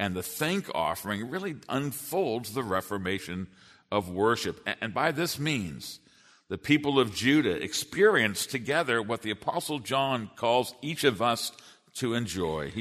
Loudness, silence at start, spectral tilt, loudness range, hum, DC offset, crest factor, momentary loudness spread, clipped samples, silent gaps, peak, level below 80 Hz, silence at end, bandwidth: -29 LUFS; 0 s; -4 dB/octave; 5 LU; none; under 0.1%; 20 dB; 10 LU; under 0.1%; none; -8 dBFS; -62 dBFS; 0 s; 13.5 kHz